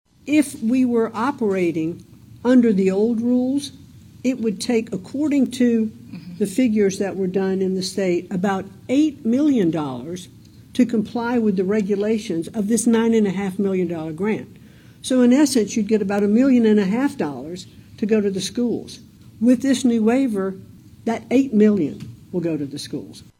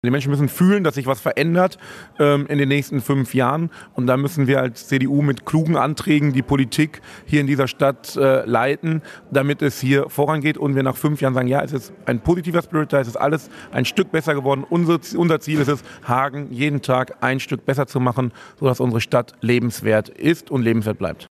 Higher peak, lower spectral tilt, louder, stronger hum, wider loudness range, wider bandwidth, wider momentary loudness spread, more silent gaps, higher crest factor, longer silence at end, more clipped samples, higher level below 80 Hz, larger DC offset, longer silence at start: about the same, -4 dBFS vs -2 dBFS; about the same, -6 dB/octave vs -6.5 dB/octave; about the same, -20 LUFS vs -20 LUFS; neither; about the same, 3 LU vs 2 LU; first, 15.5 kHz vs 14 kHz; first, 12 LU vs 5 LU; neither; about the same, 16 dB vs 16 dB; about the same, 0.15 s vs 0.05 s; neither; second, -58 dBFS vs -50 dBFS; neither; first, 0.25 s vs 0.05 s